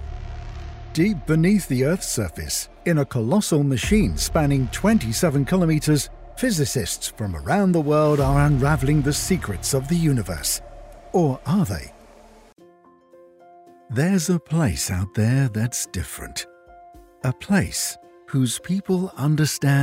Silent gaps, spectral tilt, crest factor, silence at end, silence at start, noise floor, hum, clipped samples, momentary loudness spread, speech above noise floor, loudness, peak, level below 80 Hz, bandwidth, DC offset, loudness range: none; -5.5 dB/octave; 18 dB; 0 s; 0 s; -52 dBFS; none; under 0.1%; 11 LU; 32 dB; -22 LUFS; -4 dBFS; -36 dBFS; 16 kHz; under 0.1%; 6 LU